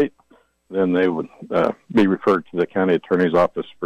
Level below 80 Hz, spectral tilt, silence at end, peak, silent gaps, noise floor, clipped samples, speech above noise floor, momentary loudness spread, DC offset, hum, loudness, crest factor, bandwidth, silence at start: -56 dBFS; -8 dB/octave; 0 s; -8 dBFS; none; -57 dBFS; under 0.1%; 38 dB; 7 LU; under 0.1%; none; -20 LUFS; 12 dB; 9 kHz; 0 s